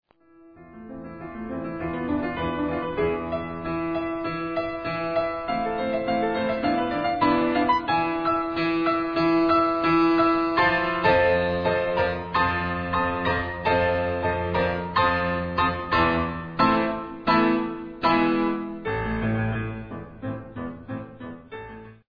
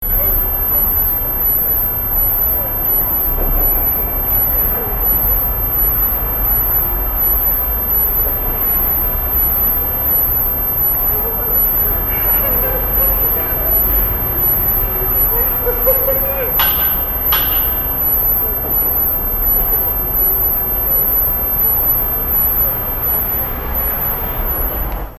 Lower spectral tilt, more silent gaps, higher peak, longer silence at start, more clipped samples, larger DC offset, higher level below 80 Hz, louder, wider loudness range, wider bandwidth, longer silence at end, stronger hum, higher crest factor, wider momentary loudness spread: first, -8 dB/octave vs -5 dB/octave; neither; second, -8 dBFS vs 0 dBFS; first, 0.6 s vs 0 s; neither; neither; second, -46 dBFS vs -24 dBFS; second, -24 LUFS vs -13 LUFS; first, 7 LU vs 1 LU; second, 5.4 kHz vs 14 kHz; first, 0.15 s vs 0 s; neither; about the same, 16 dB vs 14 dB; first, 15 LU vs 3 LU